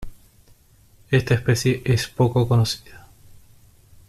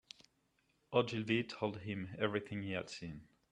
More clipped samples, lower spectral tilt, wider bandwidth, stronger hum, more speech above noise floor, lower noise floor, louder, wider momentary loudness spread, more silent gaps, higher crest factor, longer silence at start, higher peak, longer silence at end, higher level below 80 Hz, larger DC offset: neither; about the same, -6 dB/octave vs -6 dB/octave; first, 14.5 kHz vs 10.5 kHz; neither; second, 34 dB vs 39 dB; second, -54 dBFS vs -78 dBFS; first, -21 LUFS vs -39 LUFS; second, 4 LU vs 16 LU; neither; second, 18 dB vs 24 dB; second, 0 s vs 0.9 s; first, -6 dBFS vs -16 dBFS; first, 1.1 s vs 0.25 s; first, -44 dBFS vs -72 dBFS; neither